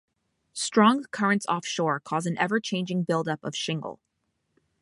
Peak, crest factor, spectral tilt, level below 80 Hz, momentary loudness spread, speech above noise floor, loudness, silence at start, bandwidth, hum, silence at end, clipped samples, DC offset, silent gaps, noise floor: -8 dBFS; 20 dB; -4.5 dB/octave; -74 dBFS; 10 LU; 51 dB; -26 LUFS; 0.55 s; 11.5 kHz; none; 0.9 s; under 0.1%; under 0.1%; none; -77 dBFS